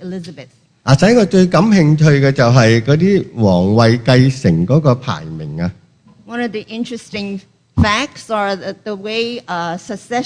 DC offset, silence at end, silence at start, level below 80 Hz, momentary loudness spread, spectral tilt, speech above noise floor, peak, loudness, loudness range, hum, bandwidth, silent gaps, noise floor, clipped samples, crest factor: under 0.1%; 0 s; 0 s; -40 dBFS; 14 LU; -6.5 dB/octave; 34 dB; 0 dBFS; -14 LUFS; 9 LU; none; 10.5 kHz; none; -47 dBFS; under 0.1%; 14 dB